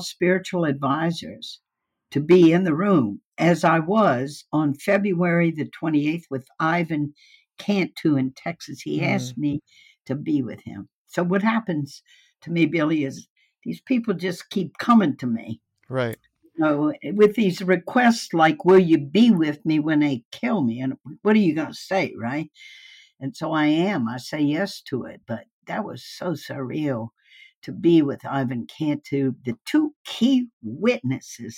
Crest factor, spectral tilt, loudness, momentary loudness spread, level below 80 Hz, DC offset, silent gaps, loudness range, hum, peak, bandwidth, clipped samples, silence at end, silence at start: 16 dB; -6.5 dB/octave; -22 LUFS; 15 LU; -68 dBFS; under 0.1%; 3.25-3.32 s, 10.93-11.05 s, 13.30-13.36 s, 20.25-20.32 s, 25.52-25.62 s, 27.55-27.62 s, 29.96-30.05 s, 30.53-30.61 s; 7 LU; none; -6 dBFS; 16 kHz; under 0.1%; 0 s; 0 s